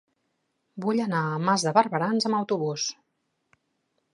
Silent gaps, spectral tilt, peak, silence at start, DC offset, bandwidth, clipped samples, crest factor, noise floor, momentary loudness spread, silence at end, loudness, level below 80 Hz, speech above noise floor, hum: none; -4.5 dB/octave; -4 dBFS; 0.75 s; under 0.1%; 11.5 kHz; under 0.1%; 22 dB; -76 dBFS; 9 LU; 1.2 s; -25 LUFS; -78 dBFS; 51 dB; none